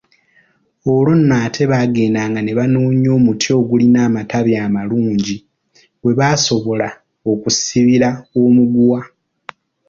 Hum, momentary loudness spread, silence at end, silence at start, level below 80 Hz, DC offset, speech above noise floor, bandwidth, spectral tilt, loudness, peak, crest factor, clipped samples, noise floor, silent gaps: none; 8 LU; 0.8 s; 0.85 s; -50 dBFS; under 0.1%; 43 dB; 7.6 kHz; -5.5 dB/octave; -14 LUFS; -2 dBFS; 12 dB; under 0.1%; -56 dBFS; none